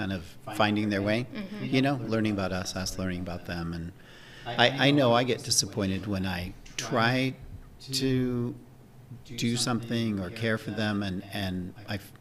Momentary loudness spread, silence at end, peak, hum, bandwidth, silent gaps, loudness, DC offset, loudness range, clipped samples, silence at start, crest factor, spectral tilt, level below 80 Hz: 14 LU; 0.05 s; -4 dBFS; none; 16 kHz; none; -28 LUFS; under 0.1%; 5 LU; under 0.1%; 0 s; 24 dB; -4.5 dB/octave; -52 dBFS